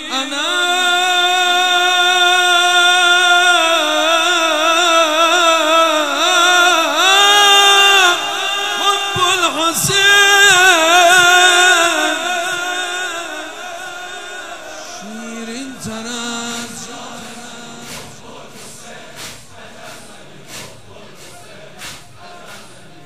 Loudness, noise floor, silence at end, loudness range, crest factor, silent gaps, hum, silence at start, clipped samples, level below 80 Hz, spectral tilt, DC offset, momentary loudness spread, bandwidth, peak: -11 LUFS; -39 dBFS; 0.4 s; 18 LU; 14 dB; none; none; 0 s; under 0.1%; -58 dBFS; -0.5 dB/octave; 0.9%; 23 LU; 16 kHz; 0 dBFS